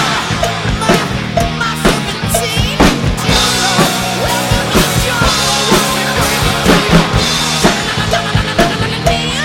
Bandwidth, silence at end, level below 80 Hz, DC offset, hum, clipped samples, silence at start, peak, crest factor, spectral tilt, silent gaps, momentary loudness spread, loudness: 17.5 kHz; 0 s; -24 dBFS; under 0.1%; none; 0.3%; 0 s; 0 dBFS; 12 dB; -3.5 dB/octave; none; 5 LU; -12 LUFS